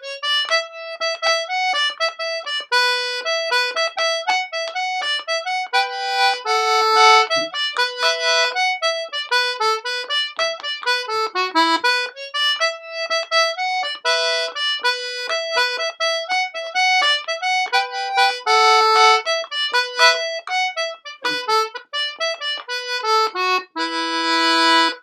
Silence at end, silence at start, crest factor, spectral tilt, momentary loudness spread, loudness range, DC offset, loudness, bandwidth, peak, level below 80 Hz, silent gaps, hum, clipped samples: 0.05 s; 0 s; 20 dB; 1 dB/octave; 9 LU; 4 LU; under 0.1%; -18 LUFS; 15 kHz; 0 dBFS; -84 dBFS; none; none; under 0.1%